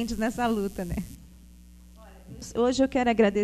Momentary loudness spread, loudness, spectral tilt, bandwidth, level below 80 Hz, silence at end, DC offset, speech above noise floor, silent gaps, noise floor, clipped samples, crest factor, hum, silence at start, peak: 19 LU; -26 LUFS; -5.5 dB/octave; 14 kHz; -46 dBFS; 0 s; under 0.1%; 24 dB; none; -50 dBFS; under 0.1%; 18 dB; none; 0 s; -8 dBFS